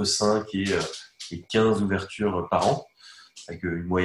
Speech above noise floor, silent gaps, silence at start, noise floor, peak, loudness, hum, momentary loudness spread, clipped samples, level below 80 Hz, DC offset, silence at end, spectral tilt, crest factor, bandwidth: 25 dB; none; 0 s; -50 dBFS; -8 dBFS; -25 LUFS; none; 16 LU; under 0.1%; -48 dBFS; under 0.1%; 0 s; -4.5 dB/octave; 18 dB; 12.5 kHz